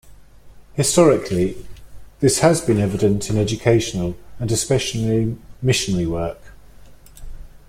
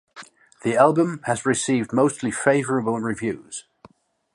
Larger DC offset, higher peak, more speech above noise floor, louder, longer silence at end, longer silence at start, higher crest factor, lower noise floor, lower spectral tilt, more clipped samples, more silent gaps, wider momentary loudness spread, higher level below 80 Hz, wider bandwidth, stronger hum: neither; about the same, -2 dBFS vs -2 dBFS; second, 25 dB vs 32 dB; first, -19 LUFS vs -22 LUFS; second, 0.1 s vs 0.75 s; about the same, 0.05 s vs 0.15 s; about the same, 18 dB vs 20 dB; second, -43 dBFS vs -53 dBFS; about the same, -5 dB/octave vs -5 dB/octave; neither; neither; about the same, 12 LU vs 11 LU; first, -40 dBFS vs -62 dBFS; first, 16 kHz vs 11.5 kHz; neither